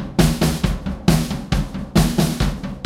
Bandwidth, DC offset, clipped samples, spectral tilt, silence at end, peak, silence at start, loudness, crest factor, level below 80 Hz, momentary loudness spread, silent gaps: 16 kHz; under 0.1%; under 0.1%; -5.5 dB/octave; 0 s; 0 dBFS; 0 s; -20 LUFS; 18 dB; -26 dBFS; 6 LU; none